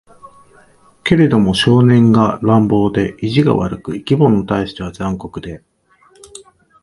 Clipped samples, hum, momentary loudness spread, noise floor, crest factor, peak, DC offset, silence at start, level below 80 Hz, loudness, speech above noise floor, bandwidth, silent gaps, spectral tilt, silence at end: under 0.1%; none; 14 LU; -52 dBFS; 14 dB; 0 dBFS; under 0.1%; 1.05 s; -40 dBFS; -14 LUFS; 39 dB; 11.5 kHz; none; -7.5 dB/octave; 0.45 s